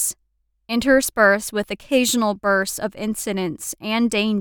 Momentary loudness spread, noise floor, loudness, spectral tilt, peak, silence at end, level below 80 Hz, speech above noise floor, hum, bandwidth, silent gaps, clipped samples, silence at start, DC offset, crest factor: 10 LU; -68 dBFS; -20 LUFS; -3 dB/octave; -4 dBFS; 0 s; -50 dBFS; 48 dB; none; over 20 kHz; none; under 0.1%; 0 s; under 0.1%; 18 dB